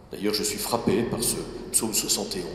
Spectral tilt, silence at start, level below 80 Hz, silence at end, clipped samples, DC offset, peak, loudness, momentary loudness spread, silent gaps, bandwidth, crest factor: -3 dB/octave; 0 s; -50 dBFS; 0 s; under 0.1%; under 0.1%; -6 dBFS; -25 LUFS; 3 LU; none; 16 kHz; 20 dB